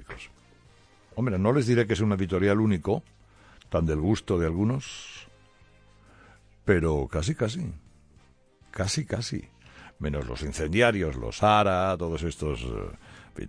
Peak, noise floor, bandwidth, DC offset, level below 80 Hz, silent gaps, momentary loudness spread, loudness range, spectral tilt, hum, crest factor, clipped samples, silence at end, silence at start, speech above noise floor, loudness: -8 dBFS; -59 dBFS; 10.5 kHz; under 0.1%; -42 dBFS; none; 18 LU; 5 LU; -6 dB/octave; none; 20 dB; under 0.1%; 0 s; 0 s; 33 dB; -27 LUFS